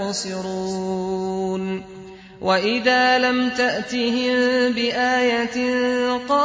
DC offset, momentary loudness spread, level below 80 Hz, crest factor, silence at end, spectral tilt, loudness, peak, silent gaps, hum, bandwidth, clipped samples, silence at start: under 0.1%; 10 LU; -56 dBFS; 14 dB; 0 s; -4 dB/octave; -20 LUFS; -6 dBFS; none; none; 8 kHz; under 0.1%; 0 s